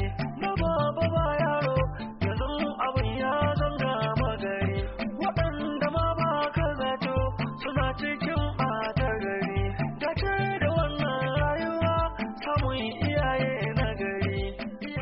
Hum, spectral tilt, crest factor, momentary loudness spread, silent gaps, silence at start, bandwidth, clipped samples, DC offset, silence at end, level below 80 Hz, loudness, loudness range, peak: none; -5 dB/octave; 14 dB; 5 LU; none; 0 s; 5.8 kHz; under 0.1%; under 0.1%; 0 s; -38 dBFS; -28 LUFS; 1 LU; -14 dBFS